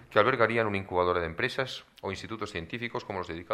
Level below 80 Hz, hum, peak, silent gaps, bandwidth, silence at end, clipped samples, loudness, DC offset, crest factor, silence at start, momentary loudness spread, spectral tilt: -58 dBFS; none; -6 dBFS; none; 13.5 kHz; 0 s; under 0.1%; -30 LUFS; under 0.1%; 24 dB; 0 s; 12 LU; -5.5 dB/octave